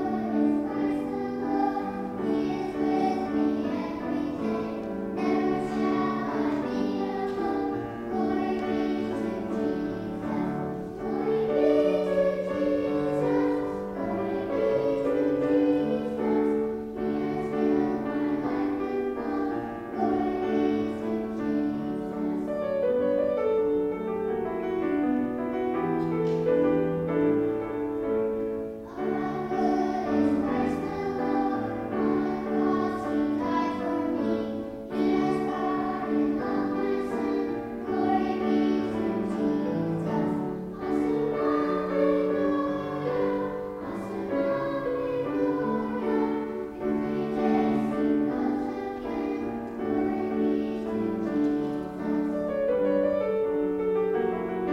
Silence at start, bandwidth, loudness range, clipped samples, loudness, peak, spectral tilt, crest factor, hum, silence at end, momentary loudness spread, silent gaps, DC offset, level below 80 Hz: 0 s; 8.6 kHz; 2 LU; under 0.1%; -28 LUFS; -12 dBFS; -8 dB/octave; 14 dB; none; 0 s; 6 LU; none; under 0.1%; -54 dBFS